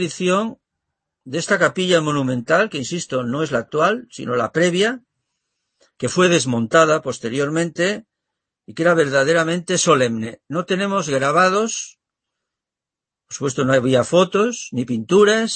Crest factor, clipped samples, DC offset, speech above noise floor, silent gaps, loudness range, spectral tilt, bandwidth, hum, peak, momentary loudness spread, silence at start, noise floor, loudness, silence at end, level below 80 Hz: 18 dB; under 0.1%; under 0.1%; 69 dB; none; 3 LU; -4.5 dB/octave; 8.8 kHz; none; -2 dBFS; 11 LU; 0 s; -87 dBFS; -18 LUFS; 0 s; -62 dBFS